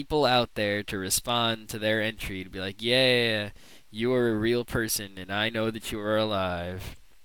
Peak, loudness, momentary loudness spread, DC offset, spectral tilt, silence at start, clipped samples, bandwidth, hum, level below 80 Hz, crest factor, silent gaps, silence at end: -10 dBFS; -27 LUFS; 13 LU; 0.3%; -3.5 dB/octave; 0 s; under 0.1%; 19.5 kHz; none; -50 dBFS; 18 dB; none; 0.3 s